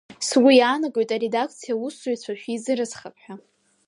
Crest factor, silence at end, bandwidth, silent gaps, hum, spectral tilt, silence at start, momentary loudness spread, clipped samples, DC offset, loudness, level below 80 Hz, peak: 18 dB; 0.5 s; 11.5 kHz; none; none; -3 dB/octave; 0.2 s; 16 LU; under 0.1%; under 0.1%; -22 LUFS; -76 dBFS; -4 dBFS